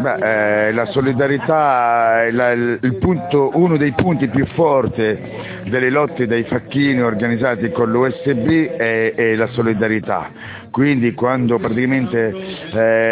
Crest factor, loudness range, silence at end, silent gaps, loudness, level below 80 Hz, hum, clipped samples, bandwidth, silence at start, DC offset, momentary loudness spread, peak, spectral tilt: 16 dB; 2 LU; 0 s; none; -16 LUFS; -44 dBFS; none; under 0.1%; 4 kHz; 0 s; under 0.1%; 6 LU; 0 dBFS; -11 dB/octave